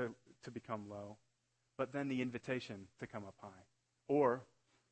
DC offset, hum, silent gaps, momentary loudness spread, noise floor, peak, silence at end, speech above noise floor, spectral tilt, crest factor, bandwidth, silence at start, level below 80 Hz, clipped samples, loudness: under 0.1%; none; none; 21 LU; -82 dBFS; -20 dBFS; 0.45 s; 41 dB; -7 dB/octave; 22 dB; 8.4 kHz; 0 s; -80 dBFS; under 0.1%; -41 LUFS